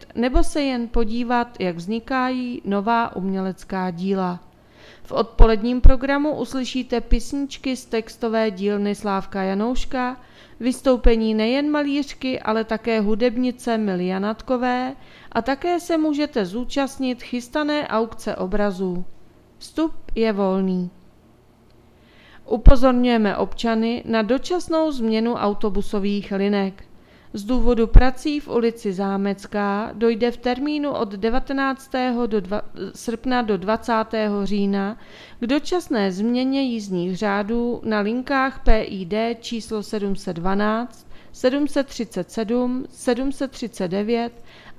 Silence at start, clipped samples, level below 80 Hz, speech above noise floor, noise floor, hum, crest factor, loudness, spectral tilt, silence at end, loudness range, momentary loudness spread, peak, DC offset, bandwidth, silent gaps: 0 s; under 0.1%; -28 dBFS; 33 dB; -52 dBFS; none; 20 dB; -22 LUFS; -6 dB/octave; 0.05 s; 3 LU; 9 LU; 0 dBFS; under 0.1%; 12.5 kHz; none